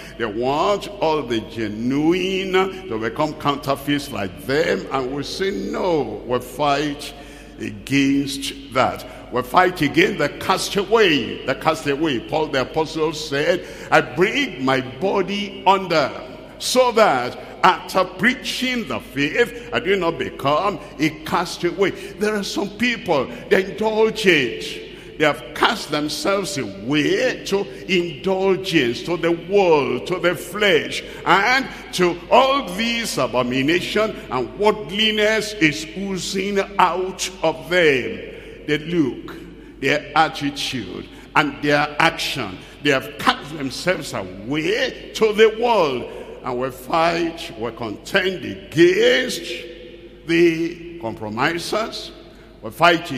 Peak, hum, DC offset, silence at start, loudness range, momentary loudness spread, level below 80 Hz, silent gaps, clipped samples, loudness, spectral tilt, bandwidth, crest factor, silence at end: 0 dBFS; none; under 0.1%; 0 s; 4 LU; 12 LU; -48 dBFS; none; under 0.1%; -20 LUFS; -4 dB/octave; 15.5 kHz; 20 dB; 0 s